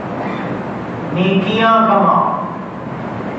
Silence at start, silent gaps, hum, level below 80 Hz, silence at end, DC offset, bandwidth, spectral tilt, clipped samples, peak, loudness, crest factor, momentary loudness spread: 0 s; none; none; -50 dBFS; 0 s; under 0.1%; 7.6 kHz; -7.5 dB/octave; under 0.1%; -2 dBFS; -16 LUFS; 16 dB; 14 LU